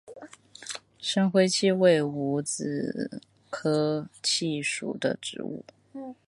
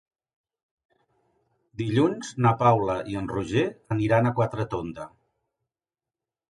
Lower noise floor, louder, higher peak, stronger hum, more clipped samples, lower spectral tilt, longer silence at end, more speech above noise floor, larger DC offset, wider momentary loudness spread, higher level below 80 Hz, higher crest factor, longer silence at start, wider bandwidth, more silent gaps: second, -47 dBFS vs under -90 dBFS; about the same, -27 LUFS vs -25 LUFS; about the same, -8 dBFS vs -6 dBFS; neither; neither; second, -4.5 dB/octave vs -7 dB/octave; second, 0.15 s vs 1.45 s; second, 21 dB vs over 66 dB; neither; first, 20 LU vs 14 LU; second, -74 dBFS vs -54 dBFS; about the same, 20 dB vs 22 dB; second, 0.05 s vs 1.8 s; about the same, 11.5 kHz vs 11 kHz; neither